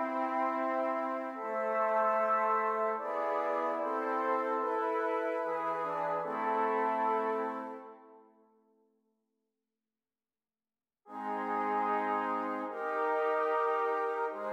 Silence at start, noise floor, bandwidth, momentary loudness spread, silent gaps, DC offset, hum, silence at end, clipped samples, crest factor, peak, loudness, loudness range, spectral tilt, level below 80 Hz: 0 s; under -90 dBFS; 9.8 kHz; 7 LU; none; under 0.1%; none; 0 s; under 0.1%; 14 dB; -20 dBFS; -33 LUFS; 9 LU; -6 dB/octave; under -90 dBFS